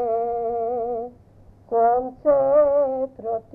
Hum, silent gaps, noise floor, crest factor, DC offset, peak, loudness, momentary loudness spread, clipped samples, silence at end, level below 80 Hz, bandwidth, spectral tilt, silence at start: none; none; -50 dBFS; 14 dB; under 0.1%; -8 dBFS; -22 LUFS; 11 LU; under 0.1%; 0.15 s; -54 dBFS; 2.6 kHz; -10 dB/octave; 0 s